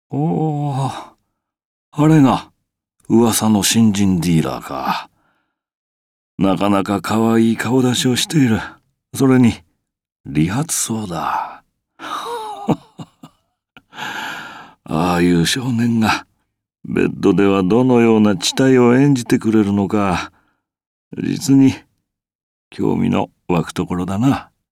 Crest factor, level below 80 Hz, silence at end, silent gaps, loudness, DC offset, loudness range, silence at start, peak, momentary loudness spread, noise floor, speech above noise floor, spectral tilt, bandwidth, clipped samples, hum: 14 dB; -48 dBFS; 0.3 s; 1.65-1.92 s, 5.75-6.38 s, 10.12-10.24 s, 20.87-21.11 s, 22.35-22.71 s; -16 LUFS; under 0.1%; 8 LU; 0.1 s; -2 dBFS; 14 LU; -73 dBFS; 58 dB; -5.5 dB/octave; 16 kHz; under 0.1%; none